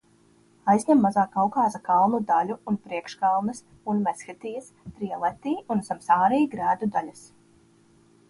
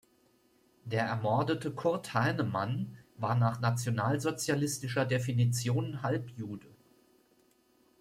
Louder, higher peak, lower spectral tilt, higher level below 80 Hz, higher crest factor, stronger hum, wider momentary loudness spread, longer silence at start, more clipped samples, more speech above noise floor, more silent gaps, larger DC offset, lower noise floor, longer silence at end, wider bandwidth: first, -24 LUFS vs -32 LUFS; first, -8 dBFS vs -16 dBFS; about the same, -6.5 dB/octave vs -5.5 dB/octave; about the same, -64 dBFS vs -68 dBFS; about the same, 18 dB vs 16 dB; neither; first, 16 LU vs 8 LU; second, 0.65 s vs 0.85 s; neither; about the same, 35 dB vs 37 dB; neither; neither; second, -60 dBFS vs -68 dBFS; second, 1.1 s vs 1.3 s; second, 11.5 kHz vs 16 kHz